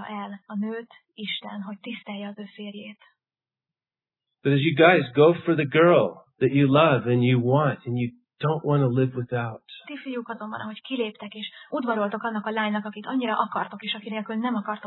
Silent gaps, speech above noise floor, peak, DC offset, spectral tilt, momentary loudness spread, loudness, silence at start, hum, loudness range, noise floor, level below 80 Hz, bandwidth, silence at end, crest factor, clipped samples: none; over 66 dB; -4 dBFS; under 0.1%; -10.5 dB/octave; 18 LU; -24 LUFS; 0 s; none; 15 LU; under -90 dBFS; -70 dBFS; 4.2 kHz; 0 s; 20 dB; under 0.1%